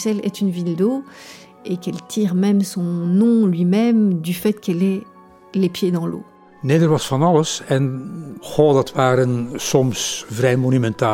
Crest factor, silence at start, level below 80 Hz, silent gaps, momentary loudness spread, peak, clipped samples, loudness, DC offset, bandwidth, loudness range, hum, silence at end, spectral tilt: 18 dB; 0 s; -56 dBFS; none; 12 LU; 0 dBFS; under 0.1%; -19 LUFS; under 0.1%; 17 kHz; 2 LU; none; 0 s; -6 dB/octave